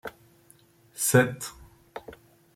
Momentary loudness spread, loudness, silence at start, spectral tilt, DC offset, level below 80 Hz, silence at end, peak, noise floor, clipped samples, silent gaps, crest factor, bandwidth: 23 LU; -24 LUFS; 0.05 s; -4.5 dB/octave; under 0.1%; -62 dBFS; 0.4 s; -8 dBFS; -59 dBFS; under 0.1%; none; 22 dB; 16.5 kHz